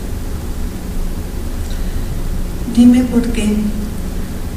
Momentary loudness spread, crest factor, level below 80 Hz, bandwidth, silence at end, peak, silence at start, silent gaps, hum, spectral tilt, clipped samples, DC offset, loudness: 15 LU; 16 dB; -20 dBFS; 15.5 kHz; 0 s; 0 dBFS; 0 s; none; none; -6.5 dB/octave; under 0.1%; under 0.1%; -18 LUFS